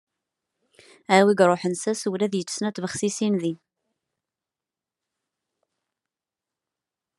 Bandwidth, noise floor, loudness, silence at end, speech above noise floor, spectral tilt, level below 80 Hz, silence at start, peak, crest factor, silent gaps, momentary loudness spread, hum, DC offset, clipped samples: 12 kHz; -89 dBFS; -23 LUFS; 3.65 s; 67 dB; -4.5 dB/octave; -74 dBFS; 1.1 s; -4 dBFS; 24 dB; none; 10 LU; none; under 0.1%; under 0.1%